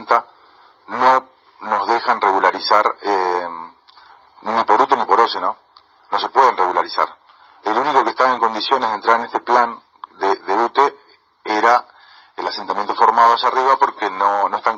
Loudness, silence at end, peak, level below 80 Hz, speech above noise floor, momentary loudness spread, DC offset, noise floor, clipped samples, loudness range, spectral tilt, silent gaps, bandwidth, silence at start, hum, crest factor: -17 LUFS; 0 s; 0 dBFS; -70 dBFS; 35 dB; 10 LU; under 0.1%; -51 dBFS; under 0.1%; 2 LU; -3 dB/octave; none; 7.6 kHz; 0 s; none; 18 dB